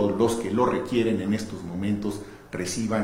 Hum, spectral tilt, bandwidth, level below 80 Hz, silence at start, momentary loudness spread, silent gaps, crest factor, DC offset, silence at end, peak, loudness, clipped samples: none; -5.5 dB/octave; 16 kHz; -52 dBFS; 0 s; 9 LU; none; 18 dB; under 0.1%; 0 s; -8 dBFS; -26 LUFS; under 0.1%